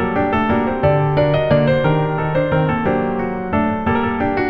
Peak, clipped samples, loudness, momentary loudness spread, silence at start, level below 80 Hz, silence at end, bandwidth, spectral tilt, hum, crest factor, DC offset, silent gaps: -2 dBFS; under 0.1%; -17 LUFS; 4 LU; 0 s; -38 dBFS; 0 s; 5.4 kHz; -9.5 dB/octave; none; 14 dB; under 0.1%; none